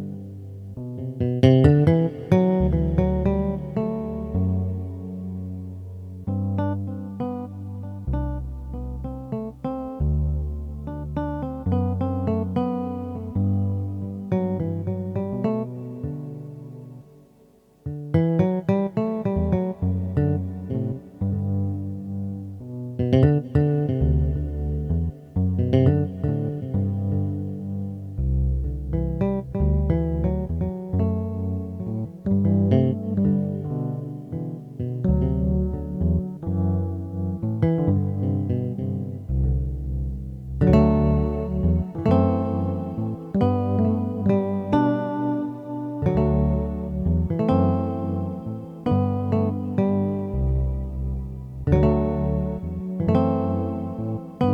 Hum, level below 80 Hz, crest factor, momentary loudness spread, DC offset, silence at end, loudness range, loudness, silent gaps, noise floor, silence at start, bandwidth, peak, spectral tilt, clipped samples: none; -32 dBFS; 22 dB; 12 LU; under 0.1%; 0 s; 7 LU; -24 LUFS; none; -55 dBFS; 0 s; 6 kHz; -2 dBFS; -10.5 dB/octave; under 0.1%